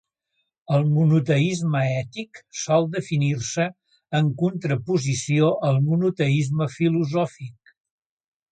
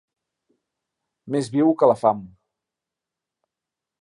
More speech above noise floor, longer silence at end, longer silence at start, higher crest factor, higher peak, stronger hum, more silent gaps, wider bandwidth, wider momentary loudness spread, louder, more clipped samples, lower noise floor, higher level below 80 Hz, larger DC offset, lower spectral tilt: second, 54 dB vs 67 dB; second, 1 s vs 1.75 s; second, 0.7 s vs 1.25 s; second, 16 dB vs 22 dB; about the same, -6 dBFS vs -4 dBFS; neither; neither; second, 9.2 kHz vs 11 kHz; about the same, 9 LU vs 10 LU; about the same, -22 LUFS vs -20 LUFS; neither; second, -76 dBFS vs -87 dBFS; first, -62 dBFS vs -68 dBFS; neither; about the same, -6.5 dB/octave vs -7.5 dB/octave